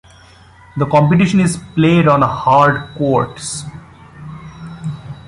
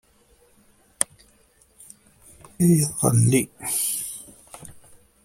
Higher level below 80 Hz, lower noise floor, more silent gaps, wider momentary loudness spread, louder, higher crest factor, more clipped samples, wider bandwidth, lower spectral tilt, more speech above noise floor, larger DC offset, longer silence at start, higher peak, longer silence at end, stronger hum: first, -44 dBFS vs -56 dBFS; second, -43 dBFS vs -59 dBFS; neither; second, 21 LU vs 24 LU; first, -14 LUFS vs -22 LUFS; second, 16 dB vs 26 dB; neither; second, 11.5 kHz vs 16.5 kHz; first, -6.5 dB/octave vs -5 dB/octave; second, 30 dB vs 39 dB; neither; second, 0.75 s vs 1 s; about the same, 0 dBFS vs 0 dBFS; second, 0.05 s vs 0.45 s; neither